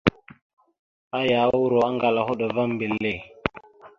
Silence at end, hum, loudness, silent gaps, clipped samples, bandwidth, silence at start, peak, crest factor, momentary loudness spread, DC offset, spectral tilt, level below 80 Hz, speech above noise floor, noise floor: 0.1 s; none; -24 LUFS; 0.42-0.57 s, 0.79-1.11 s; under 0.1%; 7.2 kHz; 0.05 s; -2 dBFS; 22 dB; 11 LU; under 0.1%; -7 dB/octave; -54 dBFS; 25 dB; -47 dBFS